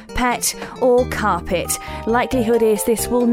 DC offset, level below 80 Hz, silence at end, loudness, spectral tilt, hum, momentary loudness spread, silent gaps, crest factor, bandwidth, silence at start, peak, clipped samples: under 0.1%; -36 dBFS; 0 s; -18 LUFS; -4 dB/octave; none; 5 LU; none; 14 dB; 16.5 kHz; 0 s; -6 dBFS; under 0.1%